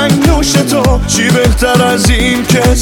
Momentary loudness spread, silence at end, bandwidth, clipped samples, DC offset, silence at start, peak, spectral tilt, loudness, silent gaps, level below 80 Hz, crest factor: 2 LU; 0 s; 19 kHz; under 0.1%; under 0.1%; 0 s; 0 dBFS; -4.5 dB/octave; -9 LUFS; none; -16 dBFS; 8 dB